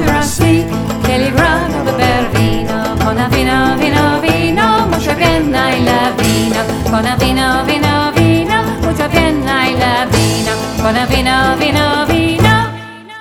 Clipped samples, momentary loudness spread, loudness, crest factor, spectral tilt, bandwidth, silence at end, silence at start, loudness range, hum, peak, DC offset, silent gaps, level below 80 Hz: under 0.1%; 4 LU; -12 LUFS; 12 dB; -5 dB/octave; 18 kHz; 0 s; 0 s; 1 LU; none; 0 dBFS; under 0.1%; none; -26 dBFS